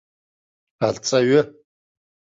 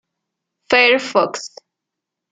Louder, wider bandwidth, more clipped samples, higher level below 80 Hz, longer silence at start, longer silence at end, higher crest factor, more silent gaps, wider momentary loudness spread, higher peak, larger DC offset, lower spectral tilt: second, -20 LUFS vs -15 LUFS; second, 7.8 kHz vs 9.2 kHz; neither; about the same, -62 dBFS vs -64 dBFS; about the same, 0.8 s vs 0.7 s; about the same, 0.9 s vs 0.85 s; about the same, 18 dB vs 20 dB; neither; second, 9 LU vs 18 LU; second, -4 dBFS vs 0 dBFS; neither; first, -4.5 dB/octave vs -2.5 dB/octave